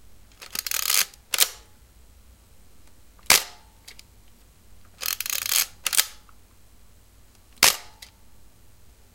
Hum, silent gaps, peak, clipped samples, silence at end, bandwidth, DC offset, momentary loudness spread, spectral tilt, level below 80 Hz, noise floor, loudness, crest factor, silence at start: none; none; 0 dBFS; under 0.1%; 1.3 s; 17.5 kHz; 0.2%; 14 LU; 1.5 dB/octave; -56 dBFS; -54 dBFS; -22 LUFS; 28 dB; 0.4 s